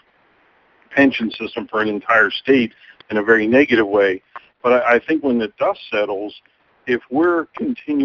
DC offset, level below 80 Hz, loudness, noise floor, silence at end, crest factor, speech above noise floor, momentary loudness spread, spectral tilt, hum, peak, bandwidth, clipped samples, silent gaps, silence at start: under 0.1%; -58 dBFS; -18 LUFS; -57 dBFS; 0 s; 18 dB; 40 dB; 11 LU; -6.5 dB/octave; none; 0 dBFS; 6.6 kHz; under 0.1%; none; 0.9 s